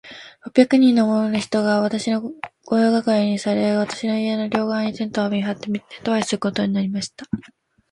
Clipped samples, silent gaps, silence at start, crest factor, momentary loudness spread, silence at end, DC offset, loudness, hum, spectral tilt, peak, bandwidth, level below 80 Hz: under 0.1%; none; 0.05 s; 20 dB; 12 LU; 0.5 s; under 0.1%; -20 LUFS; none; -5.5 dB/octave; 0 dBFS; 11 kHz; -60 dBFS